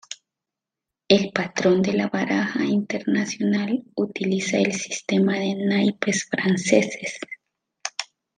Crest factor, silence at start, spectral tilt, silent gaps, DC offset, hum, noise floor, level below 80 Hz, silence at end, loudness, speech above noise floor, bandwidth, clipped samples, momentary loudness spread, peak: 20 dB; 0.1 s; -4.5 dB/octave; none; under 0.1%; none; -87 dBFS; -66 dBFS; 0.35 s; -23 LUFS; 65 dB; 9.8 kHz; under 0.1%; 12 LU; -2 dBFS